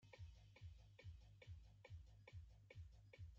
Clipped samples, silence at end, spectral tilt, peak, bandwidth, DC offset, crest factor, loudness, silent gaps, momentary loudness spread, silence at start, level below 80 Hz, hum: under 0.1%; 0 s; -5 dB/octave; -48 dBFS; 7.4 kHz; under 0.1%; 14 dB; -64 LUFS; none; 1 LU; 0 s; -68 dBFS; none